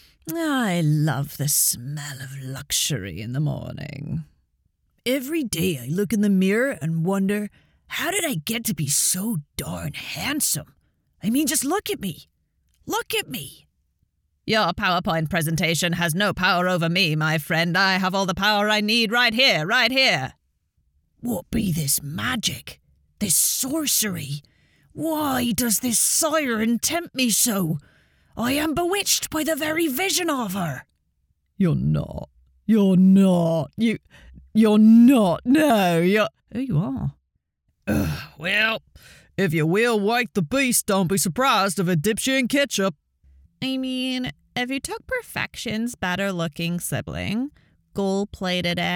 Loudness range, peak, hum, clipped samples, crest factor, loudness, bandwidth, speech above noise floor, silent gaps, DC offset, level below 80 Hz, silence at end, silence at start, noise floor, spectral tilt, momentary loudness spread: 8 LU; -4 dBFS; none; under 0.1%; 20 dB; -21 LUFS; over 20 kHz; 51 dB; none; under 0.1%; -52 dBFS; 0 s; 0.25 s; -73 dBFS; -4 dB/octave; 13 LU